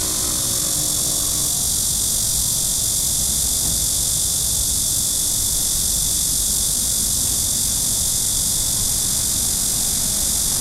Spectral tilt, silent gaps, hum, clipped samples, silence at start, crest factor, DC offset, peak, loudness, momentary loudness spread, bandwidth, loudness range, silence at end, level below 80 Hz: -1 dB/octave; none; none; under 0.1%; 0 s; 16 dB; under 0.1%; -4 dBFS; -17 LUFS; 1 LU; 16 kHz; 0 LU; 0 s; -34 dBFS